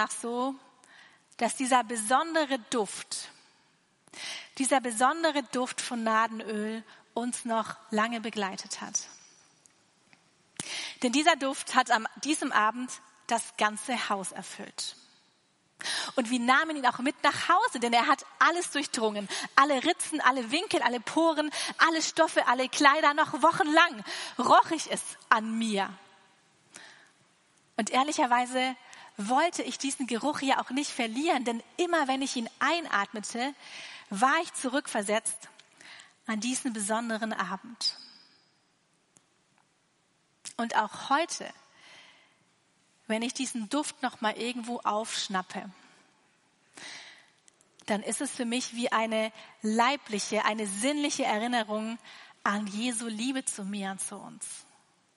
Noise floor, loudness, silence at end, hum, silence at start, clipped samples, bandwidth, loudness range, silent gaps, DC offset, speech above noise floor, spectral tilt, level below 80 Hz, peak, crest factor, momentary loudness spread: -70 dBFS; -28 LUFS; 0.55 s; none; 0 s; under 0.1%; 11.5 kHz; 9 LU; none; under 0.1%; 41 dB; -2.5 dB/octave; -84 dBFS; -2 dBFS; 28 dB; 14 LU